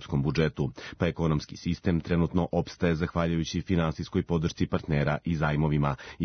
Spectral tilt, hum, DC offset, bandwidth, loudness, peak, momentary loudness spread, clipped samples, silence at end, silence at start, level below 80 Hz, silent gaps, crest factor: -7 dB/octave; none; under 0.1%; 6.6 kHz; -28 LUFS; -10 dBFS; 4 LU; under 0.1%; 0 s; 0 s; -46 dBFS; none; 18 dB